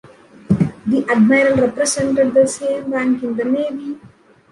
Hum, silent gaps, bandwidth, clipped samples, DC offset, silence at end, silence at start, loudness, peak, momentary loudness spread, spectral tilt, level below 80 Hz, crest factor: none; none; 11.5 kHz; under 0.1%; under 0.1%; 0.45 s; 0.5 s; -16 LUFS; -2 dBFS; 9 LU; -5.5 dB/octave; -48 dBFS; 14 dB